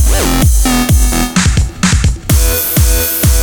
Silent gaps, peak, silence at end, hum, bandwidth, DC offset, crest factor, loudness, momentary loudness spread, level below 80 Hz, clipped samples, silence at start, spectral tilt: none; 0 dBFS; 0 s; none; over 20 kHz; under 0.1%; 10 dB; -11 LUFS; 2 LU; -12 dBFS; under 0.1%; 0 s; -4 dB/octave